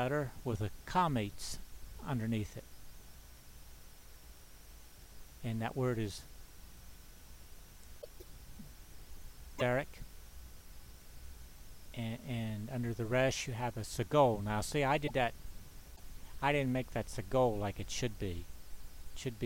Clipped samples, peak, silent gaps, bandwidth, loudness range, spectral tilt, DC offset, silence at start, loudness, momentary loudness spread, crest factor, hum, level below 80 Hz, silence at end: under 0.1%; -16 dBFS; none; 16 kHz; 11 LU; -5.5 dB/octave; under 0.1%; 0 s; -36 LUFS; 24 LU; 22 dB; none; -52 dBFS; 0 s